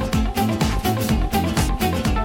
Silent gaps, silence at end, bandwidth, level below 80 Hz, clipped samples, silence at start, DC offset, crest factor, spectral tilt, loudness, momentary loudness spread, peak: none; 0 s; 17 kHz; -26 dBFS; under 0.1%; 0 s; under 0.1%; 12 dB; -5.5 dB/octave; -21 LUFS; 1 LU; -8 dBFS